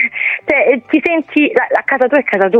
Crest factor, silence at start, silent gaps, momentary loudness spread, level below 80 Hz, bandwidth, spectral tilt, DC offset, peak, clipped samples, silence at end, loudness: 12 dB; 0 s; none; 2 LU; -58 dBFS; 6.2 kHz; -6.5 dB/octave; under 0.1%; 0 dBFS; under 0.1%; 0 s; -13 LUFS